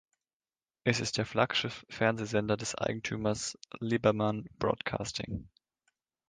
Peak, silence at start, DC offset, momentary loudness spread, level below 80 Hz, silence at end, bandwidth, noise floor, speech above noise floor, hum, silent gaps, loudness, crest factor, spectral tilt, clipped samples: -10 dBFS; 0.85 s; under 0.1%; 9 LU; -58 dBFS; 0.8 s; 10 kHz; under -90 dBFS; over 58 dB; none; none; -32 LUFS; 24 dB; -4.5 dB/octave; under 0.1%